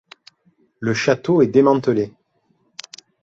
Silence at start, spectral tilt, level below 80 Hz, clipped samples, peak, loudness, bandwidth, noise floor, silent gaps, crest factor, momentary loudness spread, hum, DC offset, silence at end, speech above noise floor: 0.8 s; -6 dB/octave; -60 dBFS; under 0.1%; -2 dBFS; -18 LUFS; 7.8 kHz; -64 dBFS; none; 18 dB; 23 LU; none; under 0.1%; 1.15 s; 48 dB